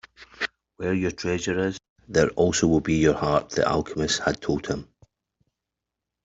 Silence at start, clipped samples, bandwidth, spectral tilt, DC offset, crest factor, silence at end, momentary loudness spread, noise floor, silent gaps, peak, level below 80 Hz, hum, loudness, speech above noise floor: 0.2 s; under 0.1%; 8 kHz; -5 dB/octave; under 0.1%; 20 dB; 1.4 s; 11 LU; -85 dBFS; 1.89-1.96 s; -6 dBFS; -48 dBFS; none; -24 LUFS; 62 dB